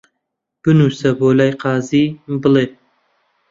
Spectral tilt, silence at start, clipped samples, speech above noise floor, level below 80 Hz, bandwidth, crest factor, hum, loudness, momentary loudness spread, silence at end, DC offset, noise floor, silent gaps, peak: -7.5 dB/octave; 0.65 s; under 0.1%; 62 dB; -54 dBFS; 7.8 kHz; 14 dB; none; -15 LUFS; 6 LU; 0.8 s; under 0.1%; -76 dBFS; none; -2 dBFS